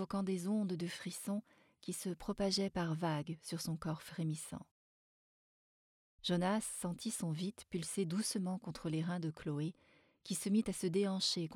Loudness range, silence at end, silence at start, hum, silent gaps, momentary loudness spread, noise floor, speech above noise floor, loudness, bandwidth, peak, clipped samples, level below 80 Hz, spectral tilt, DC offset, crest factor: 4 LU; 0 s; 0 s; none; 4.71-6.18 s; 8 LU; under -90 dBFS; over 51 dB; -39 LUFS; 18 kHz; -22 dBFS; under 0.1%; -68 dBFS; -5 dB/octave; under 0.1%; 18 dB